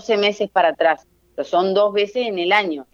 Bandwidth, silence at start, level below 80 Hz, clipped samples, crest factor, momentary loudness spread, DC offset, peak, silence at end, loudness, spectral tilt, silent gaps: 7.4 kHz; 0.05 s; -64 dBFS; under 0.1%; 18 dB; 7 LU; under 0.1%; -2 dBFS; 0.1 s; -19 LUFS; -4.5 dB/octave; none